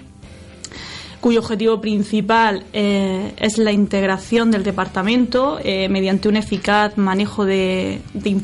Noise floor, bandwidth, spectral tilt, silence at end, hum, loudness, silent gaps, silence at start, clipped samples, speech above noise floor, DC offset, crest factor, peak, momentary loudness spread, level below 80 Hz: -39 dBFS; 11.5 kHz; -5.5 dB/octave; 0 s; none; -18 LUFS; none; 0 s; under 0.1%; 22 dB; under 0.1%; 16 dB; -2 dBFS; 7 LU; -44 dBFS